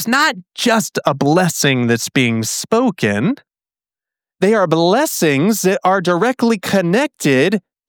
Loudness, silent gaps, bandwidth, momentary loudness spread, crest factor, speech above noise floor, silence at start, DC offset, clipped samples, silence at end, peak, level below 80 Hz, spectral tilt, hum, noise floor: -15 LUFS; none; over 20 kHz; 4 LU; 14 dB; over 75 dB; 0 s; under 0.1%; under 0.1%; 0.3 s; -2 dBFS; -64 dBFS; -4.5 dB/octave; none; under -90 dBFS